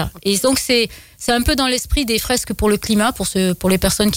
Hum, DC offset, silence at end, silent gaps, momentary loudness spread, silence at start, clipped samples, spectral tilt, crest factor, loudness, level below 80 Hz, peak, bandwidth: none; under 0.1%; 0 s; none; 4 LU; 0 s; under 0.1%; -3.5 dB/octave; 12 dB; -17 LUFS; -30 dBFS; -4 dBFS; 16.5 kHz